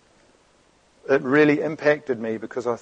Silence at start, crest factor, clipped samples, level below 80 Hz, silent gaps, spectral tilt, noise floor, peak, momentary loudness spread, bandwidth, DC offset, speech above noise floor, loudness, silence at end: 1.1 s; 18 dB; under 0.1%; -68 dBFS; none; -6.5 dB/octave; -59 dBFS; -6 dBFS; 11 LU; 8.2 kHz; under 0.1%; 38 dB; -22 LUFS; 0.05 s